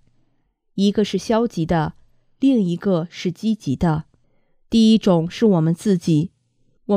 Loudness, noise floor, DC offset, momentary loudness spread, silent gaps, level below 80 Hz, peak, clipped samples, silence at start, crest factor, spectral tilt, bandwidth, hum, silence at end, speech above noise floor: -19 LUFS; -65 dBFS; under 0.1%; 10 LU; none; -46 dBFS; -4 dBFS; under 0.1%; 0.75 s; 16 dB; -7 dB/octave; 11 kHz; none; 0 s; 47 dB